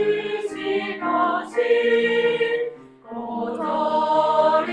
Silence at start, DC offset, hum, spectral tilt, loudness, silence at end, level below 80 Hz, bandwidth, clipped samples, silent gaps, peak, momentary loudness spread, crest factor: 0 s; under 0.1%; none; -5 dB/octave; -21 LUFS; 0 s; -66 dBFS; 9.8 kHz; under 0.1%; none; -6 dBFS; 10 LU; 14 dB